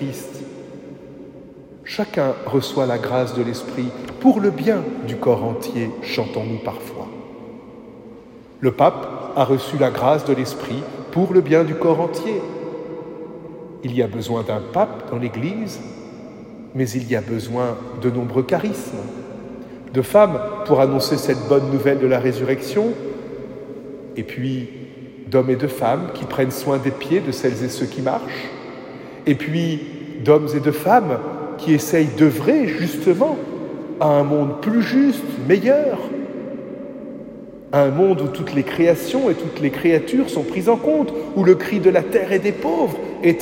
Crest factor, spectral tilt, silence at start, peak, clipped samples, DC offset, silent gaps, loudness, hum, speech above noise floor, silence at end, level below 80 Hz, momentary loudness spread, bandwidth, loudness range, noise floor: 18 dB; -6.5 dB/octave; 0 s; 0 dBFS; under 0.1%; under 0.1%; none; -19 LUFS; none; 23 dB; 0 s; -56 dBFS; 19 LU; 16.5 kHz; 7 LU; -41 dBFS